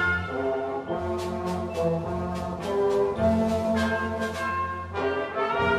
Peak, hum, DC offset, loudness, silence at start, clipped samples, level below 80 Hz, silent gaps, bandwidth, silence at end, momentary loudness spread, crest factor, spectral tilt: -12 dBFS; none; under 0.1%; -27 LUFS; 0 s; under 0.1%; -46 dBFS; none; 15 kHz; 0 s; 6 LU; 14 dB; -6.5 dB/octave